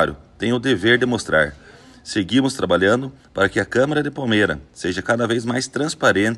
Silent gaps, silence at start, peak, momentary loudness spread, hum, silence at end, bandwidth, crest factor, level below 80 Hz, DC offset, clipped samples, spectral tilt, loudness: none; 0 s; -2 dBFS; 8 LU; none; 0 s; 12.5 kHz; 16 dB; -48 dBFS; under 0.1%; under 0.1%; -5 dB/octave; -19 LUFS